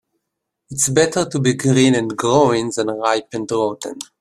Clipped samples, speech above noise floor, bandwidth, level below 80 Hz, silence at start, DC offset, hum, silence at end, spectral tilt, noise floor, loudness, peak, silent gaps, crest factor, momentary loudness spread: under 0.1%; 61 dB; 15 kHz; -56 dBFS; 0.7 s; under 0.1%; none; 0.15 s; -4.5 dB/octave; -78 dBFS; -17 LUFS; 0 dBFS; none; 18 dB; 9 LU